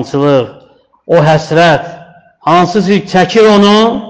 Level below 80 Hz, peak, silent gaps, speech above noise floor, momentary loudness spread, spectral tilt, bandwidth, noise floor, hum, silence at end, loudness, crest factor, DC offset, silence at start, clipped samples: -46 dBFS; 0 dBFS; none; 36 dB; 8 LU; -6 dB/octave; 8.8 kHz; -44 dBFS; none; 0 s; -9 LUFS; 10 dB; 0.3%; 0 s; under 0.1%